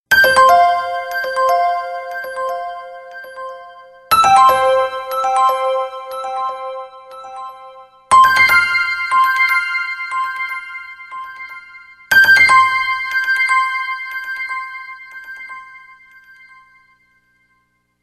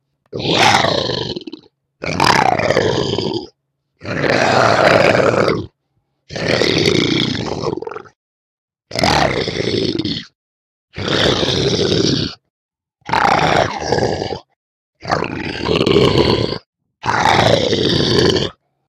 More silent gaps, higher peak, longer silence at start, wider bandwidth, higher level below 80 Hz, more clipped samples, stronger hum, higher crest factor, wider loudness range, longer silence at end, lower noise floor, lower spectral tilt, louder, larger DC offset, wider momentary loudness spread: second, none vs 8.16-8.68 s, 10.35-10.88 s, 12.50-12.69 s, 14.56-14.93 s, 16.66-16.73 s; about the same, 0 dBFS vs -2 dBFS; second, 0.1 s vs 0.3 s; about the same, 13 kHz vs 14 kHz; second, -56 dBFS vs -40 dBFS; neither; first, 60 Hz at -70 dBFS vs none; about the same, 16 dB vs 16 dB; first, 8 LU vs 4 LU; first, 2.25 s vs 0.35 s; second, -63 dBFS vs -68 dBFS; second, -1 dB/octave vs -4.5 dB/octave; about the same, -14 LUFS vs -15 LUFS; neither; first, 23 LU vs 14 LU